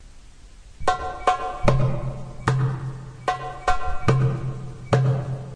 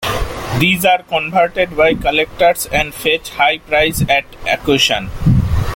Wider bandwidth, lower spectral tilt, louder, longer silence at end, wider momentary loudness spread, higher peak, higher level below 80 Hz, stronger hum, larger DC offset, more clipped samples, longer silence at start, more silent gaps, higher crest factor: second, 10 kHz vs 17 kHz; first, -7 dB/octave vs -4.5 dB/octave; second, -25 LUFS vs -14 LUFS; about the same, 0 s vs 0 s; first, 10 LU vs 5 LU; second, -4 dBFS vs 0 dBFS; second, -36 dBFS vs -28 dBFS; neither; neither; neither; about the same, 0 s vs 0 s; neither; first, 20 dB vs 14 dB